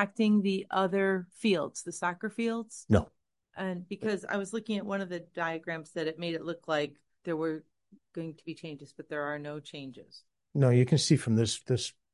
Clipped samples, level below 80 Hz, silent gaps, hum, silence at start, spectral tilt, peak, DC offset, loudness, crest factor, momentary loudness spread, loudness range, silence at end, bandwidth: under 0.1%; -56 dBFS; none; none; 0 s; -5.5 dB/octave; -10 dBFS; under 0.1%; -31 LUFS; 22 dB; 17 LU; 7 LU; 0.25 s; 11.5 kHz